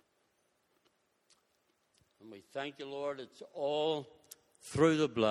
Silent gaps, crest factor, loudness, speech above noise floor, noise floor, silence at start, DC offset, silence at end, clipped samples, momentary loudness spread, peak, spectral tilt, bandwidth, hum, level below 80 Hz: none; 24 dB; -35 LUFS; 43 dB; -77 dBFS; 2.25 s; under 0.1%; 0 s; under 0.1%; 26 LU; -14 dBFS; -5.5 dB/octave; 14 kHz; none; -72 dBFS